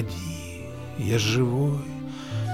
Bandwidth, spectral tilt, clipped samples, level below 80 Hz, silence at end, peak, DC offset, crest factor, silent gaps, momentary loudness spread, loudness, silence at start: 16 kHz; -5.5 dB/octave; under 0.1%; -50 dBFS; 0 s; -12 dBFS; 0.4%; 16 dB; none; 13 LU; -27 LUFS; 0 s